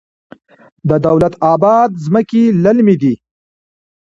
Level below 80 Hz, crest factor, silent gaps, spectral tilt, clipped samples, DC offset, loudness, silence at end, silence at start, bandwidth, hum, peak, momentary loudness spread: -46 dBFS; 12 dB; none; -9 dB/octave; under 0.1%; under 0.1%; -12 LUFS; 0.9 s; 0.85 s; 7.6 kHz; none; 0 dBFS; 6 LU